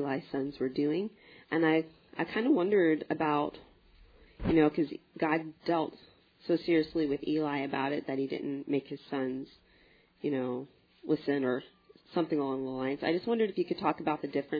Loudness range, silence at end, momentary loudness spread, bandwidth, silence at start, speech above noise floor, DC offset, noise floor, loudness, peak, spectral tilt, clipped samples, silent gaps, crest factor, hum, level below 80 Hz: 5 LU; 0 s; 11 LU; 5 kHz; 0 s; 33 dB; under 0.1%; -64 dBFS; -32 LUFS; -12 dBFS; -5 dB/octave; under 0.1%; none; 18 dB; none; -58 dBFS